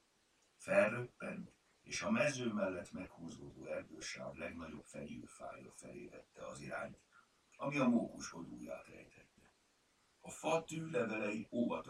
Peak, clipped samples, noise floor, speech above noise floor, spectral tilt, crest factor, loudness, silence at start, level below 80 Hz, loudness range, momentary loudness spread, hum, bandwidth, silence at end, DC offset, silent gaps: -20 dBFS; under 0.1%; -76 dBFS; 35 dB; -5 dB/octave; 22 dB; -41 LUFS; 0.6 s; -74 dBFS; 10 LU; 18 LU; none; 12.5 kHz; 0 s; under 0.1%; none